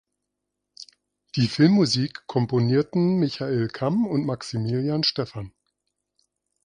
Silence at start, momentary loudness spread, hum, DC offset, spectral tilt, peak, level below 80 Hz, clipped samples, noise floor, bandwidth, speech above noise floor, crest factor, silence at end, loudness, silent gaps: 0.8 s; 16 LU; 50 Hz at -50 dBFS; under 0.1%; -6.5 dB/octave; -4 dBFS; -58 dBFS; under 0.1%; -82 dBFS; 10.5 kHz; 59 dB; 20 dB; 1.15 s; -23 LUFS; none